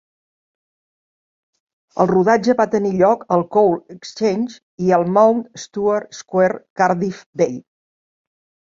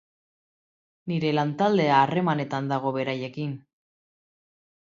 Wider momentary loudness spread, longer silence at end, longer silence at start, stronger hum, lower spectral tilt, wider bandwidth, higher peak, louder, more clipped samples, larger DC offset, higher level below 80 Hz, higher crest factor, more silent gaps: about the same, 11 LU vs 13 LU; second, 1.1 s vs 1.3 s; first, 1.95 s vs 1.05 s; neither; about the same, -6.5 dB/octave vs -7.5 dB/octave; about the same, 7.6 kHz vs 7.4 kHz; first, -2 dBFS vs -6 dBFS; first, -18 LUFS vs -25 LUFS; neither; neither; first, -60 dBFS vs -72 dBFS; about the same, 18 dB vs 22 dB; first, 4.63-4.78 s, 6.70-6.76 s, 7.26-7.33 s vs none